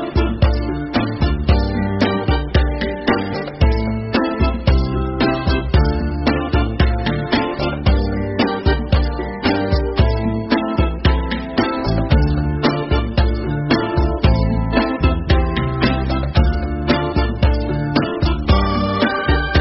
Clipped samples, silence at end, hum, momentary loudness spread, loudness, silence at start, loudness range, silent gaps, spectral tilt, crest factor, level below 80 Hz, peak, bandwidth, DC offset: under 0.1%; 0 s; none; 4 LU; -18 LUFS; 0 s; 1 LU; none; -9 dB/octave; 16 dB; -20 dBFS; -2 dBFS; 5.8 kHz; under 0.1%